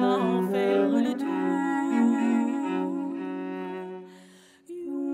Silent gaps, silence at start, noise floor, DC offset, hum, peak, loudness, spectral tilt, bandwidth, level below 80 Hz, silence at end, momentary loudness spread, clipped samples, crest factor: none; 0 s; -53 dBFS; under 0.1%; none; -12 dBFS; -26 LUFS; -7 dB/octave; 13.5 kHz; -82 dBFS; 0 s; 14 LU; under 0.1%; 14 dB